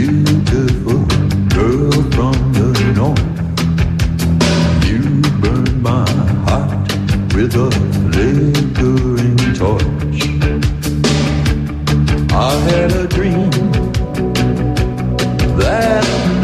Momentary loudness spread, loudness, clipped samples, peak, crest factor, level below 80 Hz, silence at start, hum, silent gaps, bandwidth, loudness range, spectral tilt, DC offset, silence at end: 4 LU; -14 LUFS; under 0.1%; -2 dBFS; 12 dB; -22 dBFS; 0 s; none; none; 14.5 kHz; 1 LU; -6.5 dB/octave; under 0.1%; 0 s